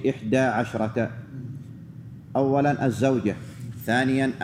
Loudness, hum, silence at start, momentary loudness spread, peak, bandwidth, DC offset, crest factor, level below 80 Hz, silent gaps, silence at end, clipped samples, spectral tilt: -24 LUFS; none; 0 s; 18 LU; -8 dBFS; 15.5 kHz; under 0.1%; 18 dB; -60 dBFS; none; 0 s; under 0.1%; -7 dB/octave